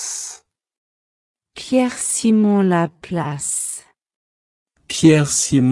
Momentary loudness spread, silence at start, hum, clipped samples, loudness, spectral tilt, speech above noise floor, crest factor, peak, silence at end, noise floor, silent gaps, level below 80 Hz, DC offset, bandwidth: 13 LU; 0 s; none; under 0.1%; -17 LUFS; -4.5 dB/octave; 26 dB; 18 dB; 0 dBFS; 0 s; -42 dBFS; 0.77-1.34 s, 4.16-4.66 s; -56 dBFS; under 0.1%; 12 kHz